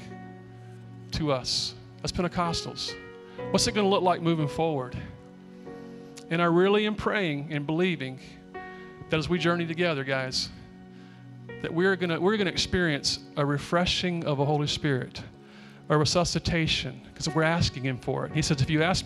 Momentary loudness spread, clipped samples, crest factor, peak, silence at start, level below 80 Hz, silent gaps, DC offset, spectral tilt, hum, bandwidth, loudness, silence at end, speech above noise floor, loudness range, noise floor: 20 LU; under 0.1%; 18 dB; -10 dBFS; 0 s; -48 dBFS; none; under 0.1%; -4.5 dB/octave; none; 13 kHz; -27 LUFS; 0 s; 22 dB; 3 LU; -48 dBFS